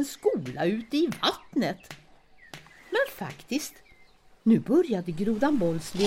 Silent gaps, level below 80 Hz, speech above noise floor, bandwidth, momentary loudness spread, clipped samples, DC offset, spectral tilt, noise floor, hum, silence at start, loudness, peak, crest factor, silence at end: none; -58 dBFS; 30 dB; 16.5 kHz; 22 LU; under 0.1%; under 0.1%; -5.5 dB/octave; -56 dBFS; none; 0 s; -27 LUFS; -10 dBFS; 18 dB; 0 s